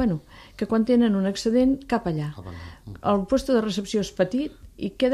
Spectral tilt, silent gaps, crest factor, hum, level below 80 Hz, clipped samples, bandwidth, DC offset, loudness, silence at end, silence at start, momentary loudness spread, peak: -6.5 dB/octave; none; 16 dB; none; -48 dBFS; under 0.1%; 13 kHz; under 0.1%; -24 LUFS; 0 s; 0 s; 14 LU; -8 dBFS